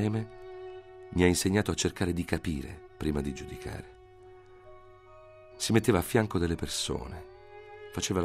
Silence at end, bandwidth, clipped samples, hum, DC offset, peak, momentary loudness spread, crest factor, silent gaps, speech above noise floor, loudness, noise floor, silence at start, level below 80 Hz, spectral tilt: 0 s; 16 kHz; under 0.1%; none; under 0.1%; -8 dBFS; 20 LU; 22 dB; none; 23 dB; -30 LUFS; -53 dBFS; 0 s; -48 dBFS; -5 dB/octave